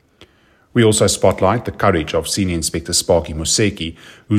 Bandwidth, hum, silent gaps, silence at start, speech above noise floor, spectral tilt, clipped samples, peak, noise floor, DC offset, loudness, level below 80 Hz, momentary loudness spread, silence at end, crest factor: 15.5 kHz; none; none; 0.2 s; 37 dB; -4 dB/octave; under 0.1%; 0 dBFS; -54 dBFS; under 0.1%; -16 LUFS; -40 dBFS; 7 LU; 0 s; 16 dB